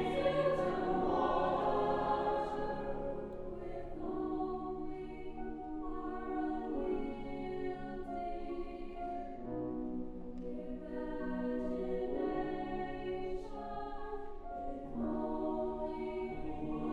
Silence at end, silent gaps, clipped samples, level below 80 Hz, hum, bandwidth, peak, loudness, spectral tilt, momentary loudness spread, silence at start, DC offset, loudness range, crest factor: 0 s; none; under 0.1%; -50 dBFS; none; 8.4 kHz; -20 dBFS; -39 LUFS; -7.5 dB/octave; 11 LU; 0 s; under 0.1%; 7 LU; 18 dB